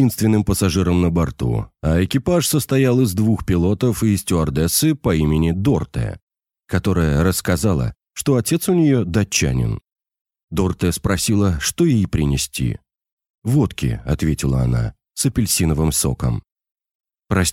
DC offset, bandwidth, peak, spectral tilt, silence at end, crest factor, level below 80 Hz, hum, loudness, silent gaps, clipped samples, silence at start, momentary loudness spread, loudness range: under 0.1%; 17 kHz; -4 dBFS; -5.5 dB/octave; 0 s; 16 dB; -32 dBFS; none; -19 LUFS; 6.22-6.27 s, 10.21-10.25 s, 10.44-10.48 s, 13.12-13.17 s, 13.30-13.42 s, 16.95-17.00 s; under 0.1%; 0 s; 7 LU; 3 LU